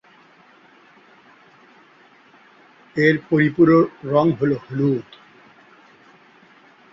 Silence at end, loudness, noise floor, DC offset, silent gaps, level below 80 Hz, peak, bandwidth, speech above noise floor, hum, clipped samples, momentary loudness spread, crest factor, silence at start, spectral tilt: 1.9 s; -18 LUFS; -52 dBFS; under 0.1%; none; -60 dBFS; -2 dBFS; 7.2 kHz; 34 dB; none; under 0.1%; 8 LU; 20 dB; 2.95 s; -9 dB/octave